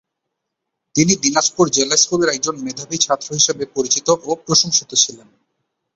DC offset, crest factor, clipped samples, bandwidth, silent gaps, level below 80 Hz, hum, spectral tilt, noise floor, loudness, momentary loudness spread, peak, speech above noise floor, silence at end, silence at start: under 0.1%; 18 dB; under 0.1%; 8.2 kHz; none; -58 dBFS; none; -2.5 dB/octave; -78 dBFS; -16 LUFS; 8 LU; 0 dBFS; 61 dB; 0.8 s; 0.95 s